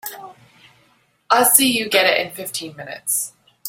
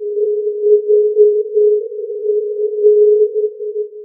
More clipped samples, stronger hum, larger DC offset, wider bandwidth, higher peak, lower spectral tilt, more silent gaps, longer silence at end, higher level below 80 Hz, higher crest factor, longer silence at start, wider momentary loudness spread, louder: neither; neither; neither; first, 16.5 kHz vs 0.6 kHz; about the same, 0 dBFS vs 0 dBFS; second, -1 dB/octave vs -13 dB/octave; neither; about the same, 0 s vs 0 s; first, -66 dBFS vs under -90 dBFS; first, 20 dB vs 12 dB; about the same, 0.05 s vs 0 s; first, 19 LU vs 10 LU; second, -17 LUFS vs -14 LUFS